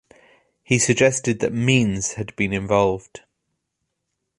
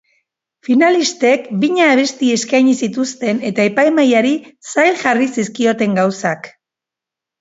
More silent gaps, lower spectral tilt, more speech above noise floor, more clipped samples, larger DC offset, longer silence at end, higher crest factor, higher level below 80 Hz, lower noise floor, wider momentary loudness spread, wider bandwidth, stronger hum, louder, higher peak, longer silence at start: neither; about the same, -4.5 dB/octave vs -4.5 dB/octave; second, 57 dB vs 71 dB; neither; neither; first, 1.2 s vs 0.9 s; first, 20 dB vs 14 dB; first, -50 dBFS vs -64 dBFS; second, -78 dBFS vs -85 dBFS; about the same, 8 LU vs 8 LU; first, 11.5 kHz vs 8 kHz; neither; second, -20 LUFS vs -14 LUFS; about the same, -2 dBFS vs 0 dBFS; about the same, 0.7 s vs 0.7 s